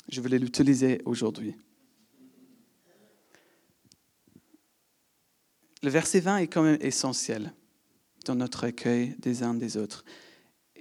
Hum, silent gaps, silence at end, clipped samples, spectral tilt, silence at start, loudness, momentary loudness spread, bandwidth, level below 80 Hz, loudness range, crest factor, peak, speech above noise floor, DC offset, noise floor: none; none; 0.65 s; under 0.1%; -5 dB/octave; 0.1 s; -28 LUFS; 13 LU; 14 kHz; -72 dBFS; 9 LU; 20 dB; -10 dBFS; 44 dB; under 0.1%; -71 dBFS